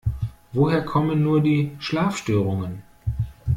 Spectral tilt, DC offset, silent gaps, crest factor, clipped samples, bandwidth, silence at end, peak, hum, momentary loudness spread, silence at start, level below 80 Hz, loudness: -7.5 dB/octave; under 0.1%; none; 16 dB; under 0.1%; 13.5 kHz; 0 s; -6 dBFS; none; 11 LU; 0.05 s; -40 dBFS; -23 LUFS